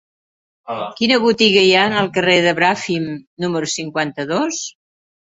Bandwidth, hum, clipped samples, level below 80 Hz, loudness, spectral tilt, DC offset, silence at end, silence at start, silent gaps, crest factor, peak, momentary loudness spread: 8.2 kHz; none; under 0.1%; -58 dBFS; -16 LUFS; -3.5 dB/octave; under 0.1%; 0.7 s; 0.65 s; 3.27-3.37 s; 16 dB; -2 dBFS; 14 LU